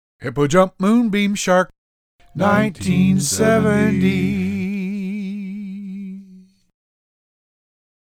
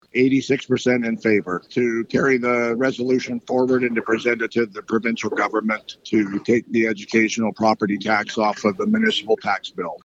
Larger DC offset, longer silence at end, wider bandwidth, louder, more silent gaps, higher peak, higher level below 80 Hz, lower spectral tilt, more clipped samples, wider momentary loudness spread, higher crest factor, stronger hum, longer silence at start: neither; first, 1.65 s vs 0.05 s; first, 16 kHz vs 8 kHz; first, -18 LUFS vs -21 LUFS; first, 1.78-2.19 s vs none; first, 0 dBFS vs -4 dBFS; first, -50 dBFS vs -64 dBFS; about the same, -5.5 dB/octave vs -5 dB/octave; neither; first, 15 LU vs 5 LU; about the same, 18 dB vs 18 dB; neither; about the same, 0.2 s vs 0.15 s